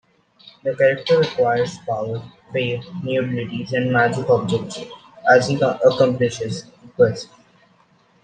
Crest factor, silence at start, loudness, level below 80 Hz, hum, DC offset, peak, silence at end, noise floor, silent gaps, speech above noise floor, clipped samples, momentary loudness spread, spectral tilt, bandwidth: 18 dB; 0.65 s; -20 LUFS; -60 dBFS; none; under 0.1%; -2 dBFS; 1 s; -57 dBFS; none; 38 dB; under 0.1%; 16 LU; -6 dB/octave; 9.4 kHz